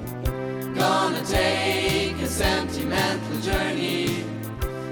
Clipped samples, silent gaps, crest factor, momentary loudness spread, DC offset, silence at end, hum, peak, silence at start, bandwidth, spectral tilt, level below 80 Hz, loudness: under 0.1%; none; 16 dB; 9 LU; under 0.1%; 0 s; none; -8 dBFS; 0 s; 19 kHz; -4.5 dB/octave; -36 dBFS; -24 LUFS